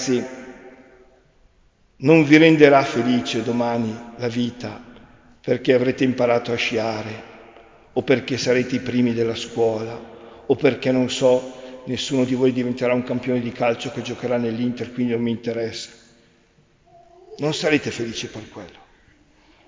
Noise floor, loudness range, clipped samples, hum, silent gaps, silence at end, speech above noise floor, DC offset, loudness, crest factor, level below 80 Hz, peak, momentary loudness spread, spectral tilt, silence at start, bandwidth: -58 dBFS; 9 LU; under 0.1%; none; none; 1 s; 38 dB; under 0.1%; -20 LUFS; 22 dB; -56 dBFS; 0 dBFS; 18 LU; -5.5 dB/octave; 0 s; 7.6 kHz